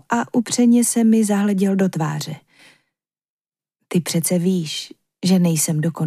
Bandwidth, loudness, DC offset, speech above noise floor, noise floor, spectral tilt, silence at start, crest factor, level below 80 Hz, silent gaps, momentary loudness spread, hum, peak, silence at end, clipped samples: 15.5 kHz; -18 LUFS; under 0.1%; 61 dB; -79 dBFS; -5 dB/octave; 0.1 s; 14 dB; -70 dBFS; 3.29-3.45 s; 12 LU; none; -6 dBFS; 0 s; under 0.1%